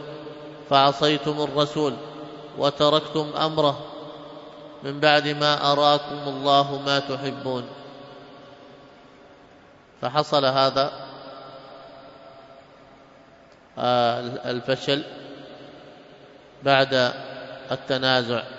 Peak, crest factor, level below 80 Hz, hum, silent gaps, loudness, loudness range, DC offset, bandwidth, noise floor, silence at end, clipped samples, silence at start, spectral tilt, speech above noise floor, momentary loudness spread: -2 dBFS; 22 dB; -64 dBFS; none; none; -22 LUFS; 8 LU; under 0.1%; 7.8 kHz; -51 dBFS; 0 s; under 0.1%; 0 s; -5 dB/octave; 29 dB; 23 LU